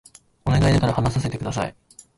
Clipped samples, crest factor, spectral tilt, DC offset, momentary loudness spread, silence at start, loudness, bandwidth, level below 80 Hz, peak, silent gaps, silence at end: under 0.1%; 14 dB; -6.5 dB/octave; under 0.1%; 11 LU; 0.45 s; -22 LUFS; 11.5 kHz; -36 dBFS; -8 dBFS; none; 0.45 s